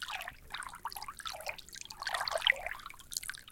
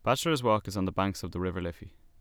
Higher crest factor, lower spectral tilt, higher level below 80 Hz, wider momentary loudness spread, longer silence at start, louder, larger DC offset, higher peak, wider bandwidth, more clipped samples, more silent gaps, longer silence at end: first, 30 dB vs 18 dB; second, 0.5 dB/octave vs -5.5 dB/octave; second, -60 dBFS vs -52 dBFS; first, 14 LU vs 11 LU; about the same, 0 s vs 0.05 s; second, -37 LUFS vs -30 LUFS; neither; about the same, -10 dBFS vs -12 dBFS; second, 17 kHz vs 20 kHz; neither; neither; second, 0 s vs 0.3 s